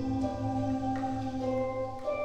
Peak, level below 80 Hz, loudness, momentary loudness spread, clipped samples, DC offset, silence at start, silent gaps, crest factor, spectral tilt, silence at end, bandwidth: -20 dBFS; -50 dBFS; -33 LUFS; 3 LU; under 0.1%; under 0.1%; 0 s; none; 12 dB; -8 dB/octave; 0 s; 9 kHz